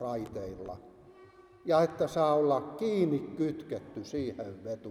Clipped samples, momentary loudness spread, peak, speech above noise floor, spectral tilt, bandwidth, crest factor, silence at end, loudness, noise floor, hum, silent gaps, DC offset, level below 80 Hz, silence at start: under 0.1%; 14 LU; -14 dBFS; 25 dB; -7 dB/octave; 15 kHz; 18 dB; 0 s; -32 LUFS; -56 dBFS; none; none; under 0.1%; -64 dBFS; 0 s